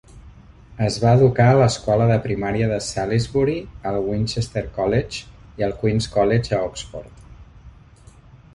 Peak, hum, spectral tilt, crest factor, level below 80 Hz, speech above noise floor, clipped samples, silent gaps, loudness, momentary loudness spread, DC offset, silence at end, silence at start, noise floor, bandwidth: -2 dBFS; none; -6.5 dB/octave; 18 dB; -42 dBFS; 28 dB; under 0.1%; none; -20 LUFS; 13 LU; under 0.1%; 0.85 s; 0.15 s; -47 dBFS; 11 kHz